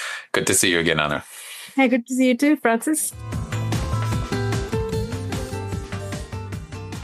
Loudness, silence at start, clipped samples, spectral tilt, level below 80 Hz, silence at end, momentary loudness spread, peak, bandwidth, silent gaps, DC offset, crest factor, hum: -22 LUFS; 0 s; under 0.1%; -4 dB/octave; -38 dBFS; 0 s; 14 LU; -2 dBFS; 15.5 kHz; none; under 0.1%; 22 dB; none